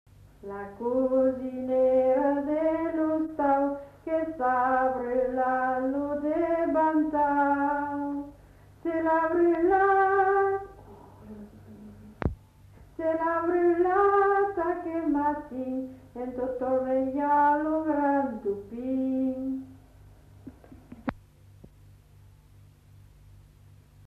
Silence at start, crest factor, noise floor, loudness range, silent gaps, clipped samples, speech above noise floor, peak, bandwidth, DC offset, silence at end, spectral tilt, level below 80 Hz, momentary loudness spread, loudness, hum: 0.45 s; 16 dB; -55 dBFS; 9 LU; none; under 0.1%; 28 dB; -12 dBFS; 5.8 kHz; under 0.1%; 2.9 s; -8.5 dB/octave; -54 dBFS; 15 LU; -26 LUFS; none